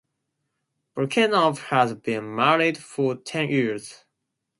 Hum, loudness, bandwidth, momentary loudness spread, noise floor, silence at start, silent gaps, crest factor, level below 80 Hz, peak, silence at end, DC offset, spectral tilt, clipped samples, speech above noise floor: none; -23 LUFS; 11.5 kHz; 10 LU; -80 dBFS; 0.95 s; none; 22 dB; -70 dBFS; -4 dBFS; 0.65 s; under 0.1%; -5 dB/octave; under 0.1%; 57 dB